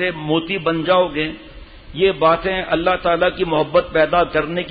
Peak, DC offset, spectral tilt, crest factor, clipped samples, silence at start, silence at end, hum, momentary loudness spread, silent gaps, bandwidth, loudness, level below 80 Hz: -4 dBFS; under 0.1%; -10.5 dB/octave; 14 dB; under 0.1%; 0 s; 0 s; none; 5 LU; none; 4.9 kHz; -18 LUFS; -42 dBFS